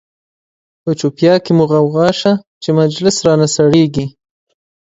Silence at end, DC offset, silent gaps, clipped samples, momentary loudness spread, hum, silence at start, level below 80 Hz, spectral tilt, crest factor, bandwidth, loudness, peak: 0.85 s; under 0.1%; 2.47-2.61 s; under 0.1%; 9 LU; none; 0.85 s; -50 dBFS; -5.5 dB/octave; 14 dB; 8 kHz; -13 LUFS; 0 dBFS